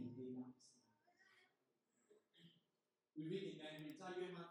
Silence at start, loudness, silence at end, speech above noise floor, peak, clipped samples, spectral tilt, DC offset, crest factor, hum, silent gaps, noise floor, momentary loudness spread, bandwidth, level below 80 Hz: 0 s; -52 LUFS; 0 s; over 39 dB; -36 dBFS; under 0.1%; -6 dB/octave; under 0.1%; 20 dB; none; none; under -90 dBFS; 11 LU; 11.5 kHz; under -90 dBFS